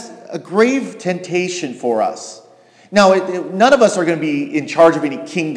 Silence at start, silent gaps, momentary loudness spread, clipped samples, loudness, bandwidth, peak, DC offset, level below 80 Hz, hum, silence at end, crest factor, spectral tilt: 0 s; none; 11 LU; under 0.1%; -15 LUFS; 11 kHz; 0 dBFS; under 0.1%; -60 dBFS; none; 0 s; 16 dB; -5 dB/octave